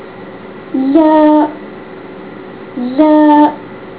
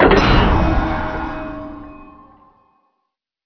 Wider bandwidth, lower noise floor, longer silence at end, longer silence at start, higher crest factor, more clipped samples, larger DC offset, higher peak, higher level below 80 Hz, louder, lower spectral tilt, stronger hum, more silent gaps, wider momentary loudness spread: second, 4 kHz vs 5.4 kHz; second, -30 dBFS vs -75 dBFS; second, 0 s vs 1.4 s; about the same, 0 s vs 0 s; second, 12 dB vs 18 dB; first, 0.3% vs under 0.1%; first, 0.4% vs under 0.1%; about the same, 0 dBFS vs 0 dBFS; second, -52 dBFS vs -24 dBFS; first, -10 LUFS vs -17 LUFS; first, -10 dB/octave vs -7 dB/octave; neither; neither; about the same, 22 LU vs 22 LU